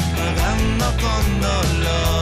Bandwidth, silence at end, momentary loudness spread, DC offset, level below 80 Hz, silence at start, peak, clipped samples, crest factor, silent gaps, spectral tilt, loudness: 15.5 kHz; 0 s; 1 LU; under 0.1%; -22 dBFS; 0 s; -8 dBFS; under 0.1%; 10 dB; none; -5 dB/octave; -19 LUFS